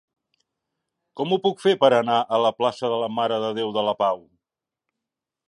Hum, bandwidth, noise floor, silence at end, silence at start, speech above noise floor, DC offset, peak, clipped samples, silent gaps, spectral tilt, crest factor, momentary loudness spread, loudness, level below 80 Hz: none; 11 kHz; -87 dBFS; 1.3 s; 1.15 s; 66 dB; under 0.1%; -4 dBFS; under 0.1%; none; -5.5 dB/octave; 20 dB; 7 LU; -22 LUFS; -72 dBFS